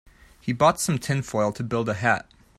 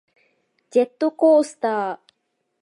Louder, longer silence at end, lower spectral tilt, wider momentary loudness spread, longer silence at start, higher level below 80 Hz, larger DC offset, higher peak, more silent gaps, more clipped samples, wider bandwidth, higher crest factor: second, -24 LUFS vs -20 LUFS; second, 0.35 s vs 0.65 s; about the same, -5 dB/octave vs -5 dB/octave; second, 7 LU vs 11 LU; second, 0.45 s vs 0.75 s; first, -54 dBFS vs -84 dBFS; neither; about the same, -6 dBFS vs -6 dBFS; neither; neither; first, 15.5 kHz vs 11.5 kHz; about the same, 20 dB vs 16 dB